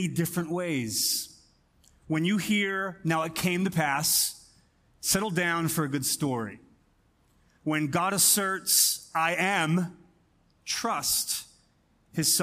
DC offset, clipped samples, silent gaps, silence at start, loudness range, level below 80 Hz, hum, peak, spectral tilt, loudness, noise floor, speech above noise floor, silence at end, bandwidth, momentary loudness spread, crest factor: under 0.1%; under 0.1%; none; 0 s; 4 LU; -62 dBFS; none; -8 dBFS; -3 dB/octave; -26 LUFS; -66 dBFS; 39 dB; 0 s; 15.5 kHz; 11 LU; 20 dB